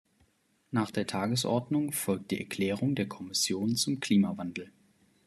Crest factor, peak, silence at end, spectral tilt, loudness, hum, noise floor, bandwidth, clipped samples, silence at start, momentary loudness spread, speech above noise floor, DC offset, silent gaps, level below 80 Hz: 18 dB; -14 dBFS; 0.55 s; -4.5 dB/octave; -30 LUFS; none; -70 dBFS; 13.5 kHz; under 0.1%; 0.7 s; 8 LU; 40 dB; under 0.1%; none; -72 dBFS